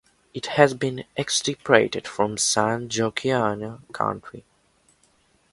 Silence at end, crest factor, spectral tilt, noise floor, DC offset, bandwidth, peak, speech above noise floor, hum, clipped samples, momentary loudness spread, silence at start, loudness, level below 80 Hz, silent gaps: 1.15 s; 24 dB; -3.5 dB/octave; -63 dBFS; under 0.1%; 11.5 kHz; 0 dBFS; 39 dB; none; under 0.1%; 15 LU; 0.35 s; -23 LUFS; -60 dBFS; none